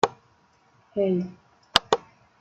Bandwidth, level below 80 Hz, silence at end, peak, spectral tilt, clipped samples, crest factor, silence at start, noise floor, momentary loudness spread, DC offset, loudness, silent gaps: 16.5 kHz; -58 dBFS; 0.45 s; 0 dBFS; -4 dB/octave; under 0.1%; 28 dB; 0.05 s; -62 dBFS; 11 LU; under 0.1%; -25 LUFS; none